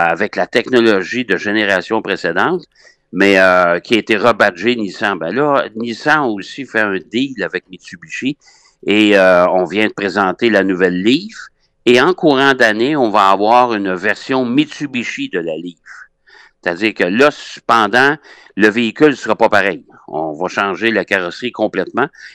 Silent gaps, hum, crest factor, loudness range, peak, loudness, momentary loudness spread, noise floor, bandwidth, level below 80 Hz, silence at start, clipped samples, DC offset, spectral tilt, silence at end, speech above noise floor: none; none; 14 dB; 5 LU; 0 dBFS; -14 LUFS; 12 LU; -46 dBFS; 13 kHz; -58 dBFS; 0 s; under 0.1%; under 0.1%; -5 dB/octave; 0.05 s; 32 dB